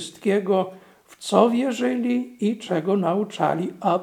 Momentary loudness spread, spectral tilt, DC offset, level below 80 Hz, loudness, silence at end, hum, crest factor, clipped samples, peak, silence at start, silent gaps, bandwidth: 7 LU; -6 dB/octave; under 0.1%; -72 dBFS; -23 LUFS; 0 s; none; 22 dB; under 0.1%; 0 dBFS; 0 s; none; 14 kHz